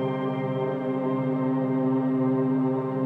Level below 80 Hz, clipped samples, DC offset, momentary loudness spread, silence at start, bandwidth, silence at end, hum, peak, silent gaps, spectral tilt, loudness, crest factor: -80 dBFS; under 0.1%; under 0.1%; 4 LU; 0 s; 3.9 kHz; 0 s; none; -14 dBFS; none; -10.5 dB/octave; -26 LUFS; 10 dB